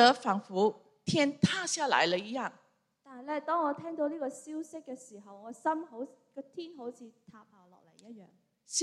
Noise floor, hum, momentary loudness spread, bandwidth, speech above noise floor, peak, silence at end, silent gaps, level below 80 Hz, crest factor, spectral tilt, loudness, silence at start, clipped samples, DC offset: -61 dBFS; none; 21 LU; 12.5 kHz; 29 dB; -8 dBFS; 0 s; none; -76 dBFS; 24 dB; -3.5 dB/octave; -32 LUFS; 0 s; under 0.1%; under 0.1%